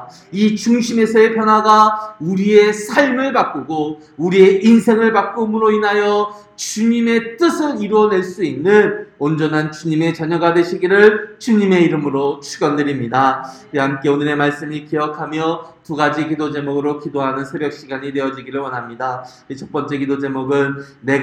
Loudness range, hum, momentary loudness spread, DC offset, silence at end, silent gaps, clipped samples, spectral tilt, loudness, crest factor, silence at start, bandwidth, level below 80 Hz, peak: 8 LU; none; 12 LU; under 0.1%; 0 s; none; under 0.1%; -5.5 dB/octave; -16 LUFS; 16 dB; 0 s; 13.5 kHz; -60 dBFS; 0 dBFS